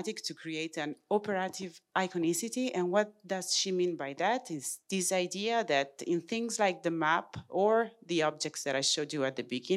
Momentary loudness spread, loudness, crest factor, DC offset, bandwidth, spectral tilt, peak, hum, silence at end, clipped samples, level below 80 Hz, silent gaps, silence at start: 8 LU; -32 LUFS; 20 dB; under 0.1%; 15.5 kHz; -3 dB/octave; -12 dBFS; none; 0 s; under 0.1%; -84 dBFS; none; 0 s